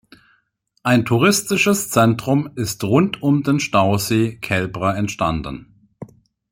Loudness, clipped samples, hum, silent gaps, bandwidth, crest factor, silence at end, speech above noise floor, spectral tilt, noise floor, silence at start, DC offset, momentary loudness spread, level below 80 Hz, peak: -18 LUFS; under 0.1%; none; none; 16.5 kHz; 18 dB; 0.45 s; 48 dB; -5 dB/octave; -65 dBFS; 0.85 s; under 0.1%; 8 LU; -48 dBFS; -2 dBFS